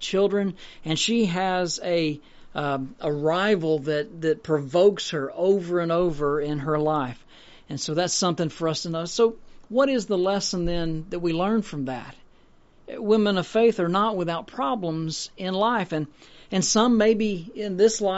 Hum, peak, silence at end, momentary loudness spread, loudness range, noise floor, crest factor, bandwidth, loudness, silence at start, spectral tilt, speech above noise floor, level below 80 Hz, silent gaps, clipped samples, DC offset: none; -8 dBFS; 0 s; 10 LU; 2 LU; -54 dBFS; 16 dB; 8 kHz; -24 LUFS; 0 s; -4.5 dB/octave; 30 dB; -48 dBFS; none; under 0.1%; under 0.1%